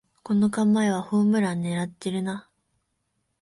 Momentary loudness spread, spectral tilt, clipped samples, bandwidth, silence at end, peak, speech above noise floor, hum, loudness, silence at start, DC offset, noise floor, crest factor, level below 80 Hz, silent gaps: 8 LU; -6.5 dB/octave; under 0.1%; 11.5 kHz; 1 s; -12 dBFS; 52 dB; none; -24 LUFS; 0.25 s; under 0.1%; -75 dBFS; 14 dB; -66 dBFS; none